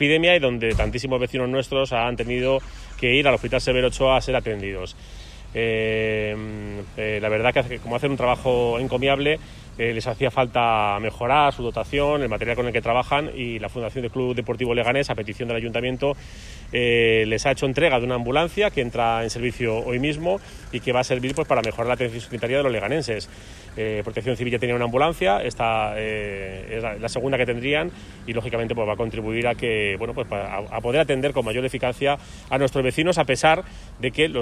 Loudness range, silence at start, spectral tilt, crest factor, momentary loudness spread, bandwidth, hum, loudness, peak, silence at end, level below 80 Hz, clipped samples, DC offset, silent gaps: 4 LU; 0 s; -5 dB/octave; 18 dB; 10 LU; 14 kHz; none; -23 LUFS; -4 dBFS; 0 s; -40 dBFS; under 0.1%; under 0.1%; none